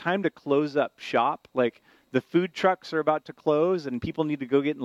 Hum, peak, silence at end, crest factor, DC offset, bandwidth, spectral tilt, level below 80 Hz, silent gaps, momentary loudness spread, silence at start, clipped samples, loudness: none; -8 dBFS; 0 s; 18 dB; under 0.1%; 10.5 kHz; -7 dB/octave; -62 dBFS; none; 5 LU; 0 s; under 0.1%; -26 LUFS